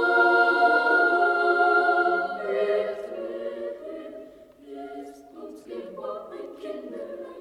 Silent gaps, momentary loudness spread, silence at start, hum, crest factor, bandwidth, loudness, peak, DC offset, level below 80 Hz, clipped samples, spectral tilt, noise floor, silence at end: none; 22 LU; 0 s; none; 16 dB; 11 kHz; -22 LUFS; -10 dBFS; under 0.1%; -68 dBFS; under 0.1%; -4.5 dB/octave; -47 dBFS; 0 s